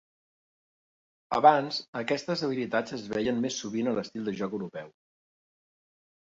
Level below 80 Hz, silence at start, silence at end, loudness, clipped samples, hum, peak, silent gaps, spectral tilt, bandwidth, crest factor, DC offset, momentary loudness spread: -68 dBFS; 1.3 s; 1.5 s; -29 LUFS; under 0.1%; none; -6 dBFS; 1.88-1.93 s; -4.5 dB/octave; 7.8 kHz; 26 dB; under 0.1%; 12 LU